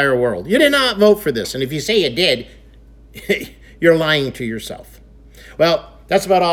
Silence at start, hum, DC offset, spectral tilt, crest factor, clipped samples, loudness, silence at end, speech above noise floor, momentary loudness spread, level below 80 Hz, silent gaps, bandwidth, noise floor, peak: 0 s; none; under 0.1%; -4.5 dB/octave; 16 dB; under 0.1%; -16 LUFS; 0 s; 27 dB; 15 LU; -44 dBFS; none; 19 kHz; -43 dBFS; 0 dBFS